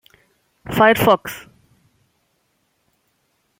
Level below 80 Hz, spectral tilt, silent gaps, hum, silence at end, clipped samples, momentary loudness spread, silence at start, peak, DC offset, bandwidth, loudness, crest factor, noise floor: -52 dBFS; -5 dB/octave; none; none; 2.2 s; under 0.1%; 23 LU; 0.7 s; -2 dBFS; under 0.1%; 16.5 kHz; -16 LUFS; 20 dB; -67 dBFS